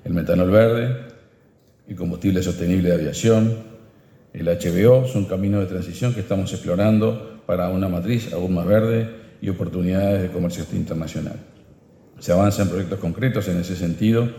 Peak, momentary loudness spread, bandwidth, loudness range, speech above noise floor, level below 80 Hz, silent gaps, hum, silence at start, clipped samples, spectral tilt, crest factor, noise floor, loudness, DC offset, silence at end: -2 dBFS; 12 LU; 17 kHz; 4 LU; 36 dB; -46 dBFS; none; none; 0.05 s; under 0.1%; -7.5 dB/octave; 18 dB; -55 dBFS; -21 LUFS; under 0.1%; 0 s